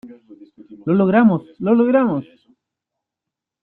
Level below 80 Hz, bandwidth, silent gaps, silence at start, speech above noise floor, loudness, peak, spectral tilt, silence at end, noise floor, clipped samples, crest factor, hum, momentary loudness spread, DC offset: -62 dBFS; 4.1 kHz; none; 0.05 s; 69 dB; -17 LUFS; -4 dBFS; -11.5 dB/octave; 1.4 s; -84 dBFS; under 0.1%; 16 dB; none; 10 LU; under 0.1%